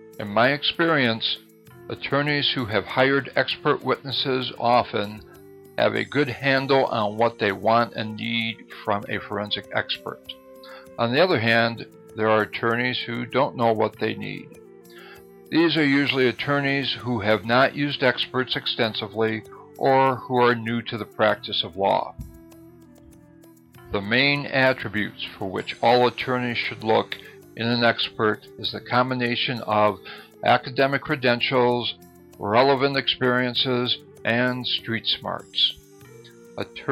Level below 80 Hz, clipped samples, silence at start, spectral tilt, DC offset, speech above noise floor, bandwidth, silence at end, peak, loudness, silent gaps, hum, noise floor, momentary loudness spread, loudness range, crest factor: -60 dBFS; under 0.1%; 0 s; -6 dB/octave; under 0.1%; 28 dB; 15.5 kHz; 0 s; -4 dBFS; -22 LUFS; none; none; -50 dBFS; 12 LU; 3 LU; 20 dB